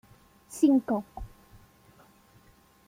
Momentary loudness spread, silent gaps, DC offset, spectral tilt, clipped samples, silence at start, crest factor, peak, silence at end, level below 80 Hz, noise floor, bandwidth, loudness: 23 LU; none; under 0.1%; -6 dB/octave; under 0.1%; 0.5 s; 20 dB; -12 dBFS; 1.6 s; -54 dBFS; -60 dBFS; 16 kHz; -26 LUFS